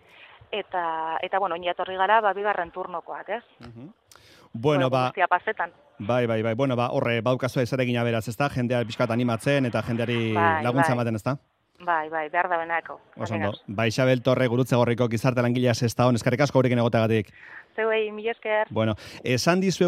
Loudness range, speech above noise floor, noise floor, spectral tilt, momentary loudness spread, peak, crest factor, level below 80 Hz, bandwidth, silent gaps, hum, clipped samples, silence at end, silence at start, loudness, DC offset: 4 LU; 29 dB; -53 dBFS; -6 dB/octave; 11 LU; -6 dBFS; 20 dB; -62 dBFS; 15 kHz; none; none; under 0.1%; 0 s; 0.2 s; -25 LUFS; under 0.1%